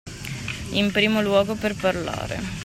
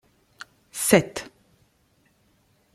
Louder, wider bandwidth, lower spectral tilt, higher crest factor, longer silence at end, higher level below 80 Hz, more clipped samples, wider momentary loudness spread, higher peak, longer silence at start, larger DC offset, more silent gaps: about the same, -23 LUFS vs -22 LUFS; about the same, 16 kHz vs 16 kHz; about the same, -5 dB/octave vs -4 dB/octave; second, 18 dB vs 26 dB; second, 0 s vs 1.5 s; first, -44 dBFS vs -62 dBFS; neither; second, 11 LU vs 26 LU; second, -6 dBFS vs -2 dBFS; second, 0.05 s vs 0.75 s; neither; neither